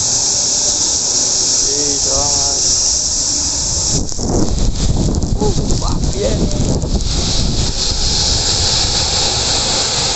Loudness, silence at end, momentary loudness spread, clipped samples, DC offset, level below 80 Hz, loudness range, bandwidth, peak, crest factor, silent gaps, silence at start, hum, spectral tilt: -13 LUFS; 0 s; 6 LU; under 0.1%; under 0.1%; -22 dBFS; 5 LU; 9 kHz; -2 dBFS; 12 dB; none; 0 s; none; -2.5 dB/octave